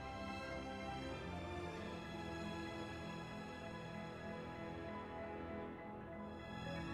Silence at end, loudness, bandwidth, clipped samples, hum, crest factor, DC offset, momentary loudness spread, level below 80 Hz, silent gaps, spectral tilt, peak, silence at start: 0 s; -48 LUFS; 14 kHz; under 0.1%; none; 14 dB; under 0.1%; 3 LU; -62 dBFS; none; -6 dB/octave; -34 dBFS; 0 s